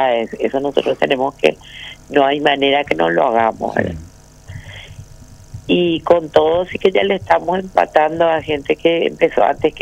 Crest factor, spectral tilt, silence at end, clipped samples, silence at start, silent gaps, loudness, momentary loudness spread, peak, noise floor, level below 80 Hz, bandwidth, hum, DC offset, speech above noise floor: 16 dB; -5.5 dB/octave; 0 s; under 0.1%; 0 s; none; -16 LUFS; 18 LU; 0 dBFS; -39 dBFS; -44 dBFS; 11.5 kHz; none; under 0.1%; 24 dB